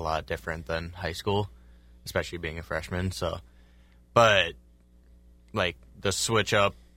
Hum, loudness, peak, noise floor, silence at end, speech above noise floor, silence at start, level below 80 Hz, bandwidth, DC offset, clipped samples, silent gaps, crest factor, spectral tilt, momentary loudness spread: 60 Hz at -60 dBFS; -28 LUFS; -6 dBFS; -56 dBFS; 0.25 s; 29 dB; 0 s; -50 dBFS; 16 kHz; under 0.1%; under 0.1%; none; 24 dB; -3.5 dB/octave; 13 LU